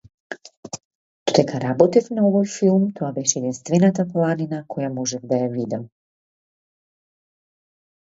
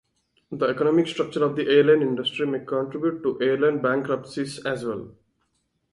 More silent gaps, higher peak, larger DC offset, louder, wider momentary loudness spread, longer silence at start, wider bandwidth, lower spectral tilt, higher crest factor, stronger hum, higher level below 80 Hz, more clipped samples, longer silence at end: first, 0.57-0.63 s, 0.85-1.26 s vs none; first, 0 dBFS vs -6 dBFS; neither; about the same, -21 LUFS vs -23 LUFS; first, 18 LU vs 10 LU; second, 0.3 s vs 0.5 s; second, 8 kHz vs 11.5 kHz; about the same, -5.5 dB/octave vs -6 dB/octave; about the same, 22 dB vs 18 dB; neither; about the same, -64 dBFS vs -66 dBFS; neither; first, 2.2 s vs 0.8 s